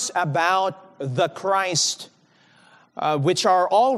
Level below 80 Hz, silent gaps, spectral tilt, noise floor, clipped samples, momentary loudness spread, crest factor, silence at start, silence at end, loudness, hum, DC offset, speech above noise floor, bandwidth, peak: -80 dBFS; none; -3.5 dB/octave; -57 dBFS; under 0.1%; 15 LU; 16 dB; 0 s; 0 s; -21 LUFS; none; under 0.1%; 36 dB; 13 kHz; -6 dBFS